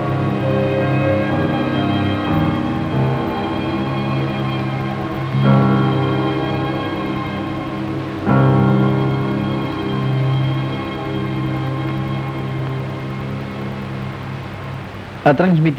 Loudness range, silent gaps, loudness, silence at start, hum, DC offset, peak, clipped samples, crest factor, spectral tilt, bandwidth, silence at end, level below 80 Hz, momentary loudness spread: 5 LU; none; -19 LUFS; 0 s; none; under 0.1%; 0 dBFS; under 0.1%; 18 dB; -8.5 dB/octave; 6.4 kHz; 0 s; -42 dBFS; 11 LU